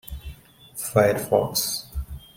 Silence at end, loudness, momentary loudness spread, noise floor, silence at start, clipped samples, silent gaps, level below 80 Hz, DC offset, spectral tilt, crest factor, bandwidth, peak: 0.2 s; -23 LUFS; 19 LU; -44 dBFS; 0.05 s; under 0.1%; none; -40 dBFS; under 0.1%; -4 dB/octave; 20 dB; 16.5 kHz; -4 dBFS